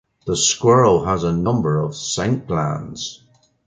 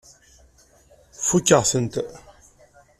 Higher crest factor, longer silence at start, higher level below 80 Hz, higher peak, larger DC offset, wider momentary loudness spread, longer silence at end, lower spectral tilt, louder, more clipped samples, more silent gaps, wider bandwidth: second, 16 dB vs 22 dB; second, 0.25 s vs 1.2 s; first, -44 dBFS vs -54 dBFS; about the same, -2 dBFS vs -4 dBFS; neither; about the same, 13 LU vs 14 LU; second, 0.5 s vs 0.8 s; about the same, -4.5 dB/octave vs -4 dB/octave; about the same, -18 LUFS vs -20 LUFS; neither; neither; second, 9.6 kHz vs 15 kHz